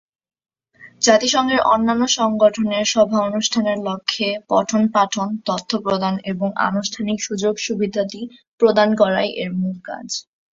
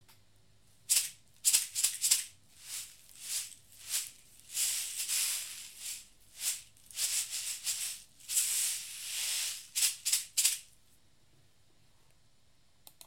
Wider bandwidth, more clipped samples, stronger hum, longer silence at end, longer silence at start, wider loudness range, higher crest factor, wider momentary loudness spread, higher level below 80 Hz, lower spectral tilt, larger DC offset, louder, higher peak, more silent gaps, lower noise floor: second, 7.8 kHz vs 17 kHz; neither; neither; second, 0.3 s vs 2.4 s; first, 0.8 s vs 0.1 s; about the same, 4 LU vs 4 LU; second, 18 dB vs 28 dB; second, 9 LU vs 16 LU; first, -58 dBFS vs -76 dBFS; first, -3.5 dB/octave vs 4 dB/octave; neither; first, -19 LUFS vs -32 LUFS; first, -2 dBFS vs -8 dBFS; first, 8.48-8.58 s vs none; second, -47 dBFS vs -70 dBFS